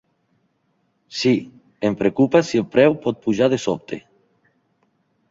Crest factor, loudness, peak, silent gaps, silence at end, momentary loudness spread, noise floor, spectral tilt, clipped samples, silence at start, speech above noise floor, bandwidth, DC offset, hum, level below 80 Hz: 20 dB; -19 LUFS; -2 dBFS; none; 1.3 s; 12 LU; -67 dBFS; -6 dB/octave; under 0.1%; 1.1 s; 49 dB; 7.8 kHz; under 0.1%; none; -60 dBFS